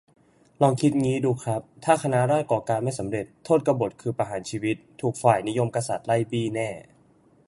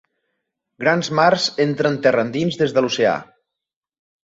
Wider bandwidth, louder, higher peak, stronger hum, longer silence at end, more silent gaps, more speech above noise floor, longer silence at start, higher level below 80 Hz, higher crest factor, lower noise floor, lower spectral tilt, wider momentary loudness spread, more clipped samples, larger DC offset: first, 11.5 kHz vs 8 kHz; second, -25 LUFS vs -18 LUFS; about the same, -4 dBFS vs -2 dBFS; neither; second, 0.65 s vs 1 s; neither; second, 34 dB vs 67 dB; second, 0.6 s vs 0.8 s; about the same, -60 dBFS vs -62 dBFS; about the same, 20 dB vs 18 dB; second, -59 dBFS vs -85 dBFS; first, -6.5 dB/octave vs -5 dB/octave; first, 8 LU vs 5 LU; neither; neither